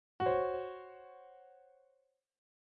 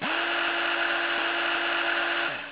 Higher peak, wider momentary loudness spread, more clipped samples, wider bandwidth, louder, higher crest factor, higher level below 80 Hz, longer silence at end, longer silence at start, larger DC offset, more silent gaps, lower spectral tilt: second, -22 dBFS vs -14 dBFS; first, 24 LU vs 1 LU; neither; first, 4.9 kHz vs 4 kHz; second, -36 LUFS vs -25 LUFS; first, 20 dB vs 12 dB; about the same, -70 dBFS vs -72 dBFS; first, 1.3 s vs 0 s; first, 0.2 s vs 0 s; neither; neither; first, -4.5 dB/octave vs 1.5 dB/octave